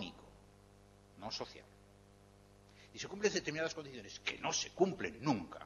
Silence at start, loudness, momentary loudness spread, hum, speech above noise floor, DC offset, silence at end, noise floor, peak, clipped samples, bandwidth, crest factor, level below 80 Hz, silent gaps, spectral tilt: 0 s; -39 LUFS; 17 LU; 50 Hz at -65 dBFS; 24 dB; under 0.1%; 0 s; -63 dBFS; -18 dBFS; under 0.1%; 12 kHz; 24 dB; -68 dBFS; none; -3.5 dB/octave